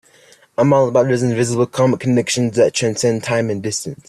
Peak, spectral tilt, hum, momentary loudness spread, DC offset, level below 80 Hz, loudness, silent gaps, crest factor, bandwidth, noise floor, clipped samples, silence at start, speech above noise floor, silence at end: -2 dBFS; -5 dB/octave; none; 6 LU; under 0.1%; -54 dBFS; -16 LUFS; none; 14 dB; 13 kHz; -49 dBFS; under 0.1%; 0.6 s; 33 dB; 0.15 s